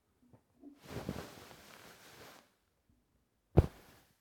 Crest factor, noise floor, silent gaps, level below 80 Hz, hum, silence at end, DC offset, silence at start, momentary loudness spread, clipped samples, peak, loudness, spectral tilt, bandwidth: 30 dB; -77 dBFS; none; -50 dBFS; none; 0.5 s; under 0.1%; 0.65 s; 26 LU; under 0.1%; -10 dBFS; -37 LUFS; -7.5 dB/octave; 18.5 kHz